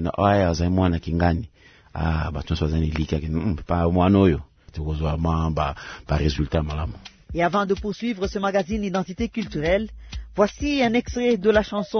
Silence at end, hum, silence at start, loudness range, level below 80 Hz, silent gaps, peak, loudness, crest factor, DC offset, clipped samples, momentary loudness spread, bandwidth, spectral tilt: 0 s; none; 0 s; 2 LU; -36 dBFS; none; -4 dBFS; -23 LUFS; 18 dB; under 0.1%; under 0.1%; 11 LU; 6.6 kHz; -7 dB/octave